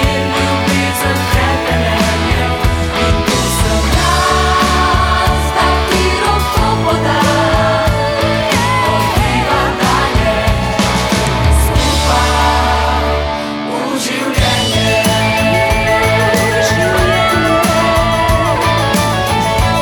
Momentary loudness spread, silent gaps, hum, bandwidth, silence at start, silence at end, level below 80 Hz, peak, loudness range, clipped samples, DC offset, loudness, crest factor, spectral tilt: 3 LU; none; none; over 20 kHz; 0 s; 0 s; -20 dBFS; 0 dBFS; 2 LU; under 0.1%; under 0.1%; -12 LUFS; 12 dB; -4.5 dB/octave